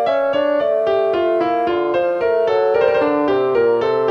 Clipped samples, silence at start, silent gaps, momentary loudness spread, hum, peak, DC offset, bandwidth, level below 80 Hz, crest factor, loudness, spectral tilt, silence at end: under 0.1%; 0 s; none; 3 LU; none; -2 dBFS; under 0.1%; 6.4 kHz; -54 dBFS; 14 dB; -17 LUFS; -6.5 dB/octave; 0 s